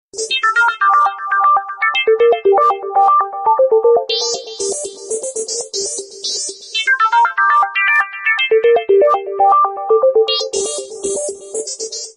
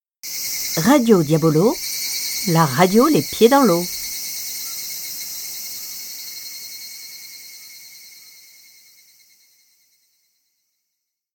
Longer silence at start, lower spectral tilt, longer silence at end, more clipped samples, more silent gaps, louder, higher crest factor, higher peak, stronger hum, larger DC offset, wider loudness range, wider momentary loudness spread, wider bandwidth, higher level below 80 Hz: about the same, 0.15 s vs 0.25 s; second, 0.5 dB/octave vs -4.5 dB/octave; second, 0.05 s vs 3.15 s; neither; neither; first, -14 LUFS vs -19 LUFS; second, 12 dB vs 20 dB; about the same, -2 dBFS vs 0 dBFS; neither; neither; second, 4 LU vs 20 LU; second, 10 LU vs 21 LU; second, 11 kHz vs 19 kHz; second, -64 dBFS vs -58 dBFS